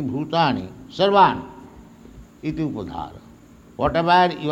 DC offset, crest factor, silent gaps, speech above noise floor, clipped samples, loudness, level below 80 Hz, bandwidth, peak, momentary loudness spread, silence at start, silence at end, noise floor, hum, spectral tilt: under 0.1%; 20 dB; none; 27 dB; under 0.1%; -20 LUFS; -48 dBFS; 9.6 kHz; -2 dBFS; 19 LU; 0 s; 0 s; -47 dBFS; none; -6.5 dB/octave